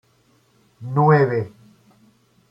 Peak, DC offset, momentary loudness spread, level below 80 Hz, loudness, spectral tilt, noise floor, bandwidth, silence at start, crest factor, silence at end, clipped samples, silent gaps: -4 dBFS; under 0.1%; 20 LU; -62 dBFS; -18 LUFS; -10 dB/octave; -60 dBFS; 5.6 kHz; 0.8 s; 18 dB; 1.05 s; under 0.1%; none